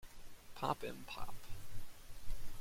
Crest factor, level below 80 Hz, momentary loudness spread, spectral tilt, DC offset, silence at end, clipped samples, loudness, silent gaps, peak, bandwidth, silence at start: 18 dB; -50 dBFS; 17 LU; -4.5 dB/octave; under 0.1%; 0 s; under 0.1%; -47 LUFS; none; -22 dBFS; 16.5 kHz; 0 s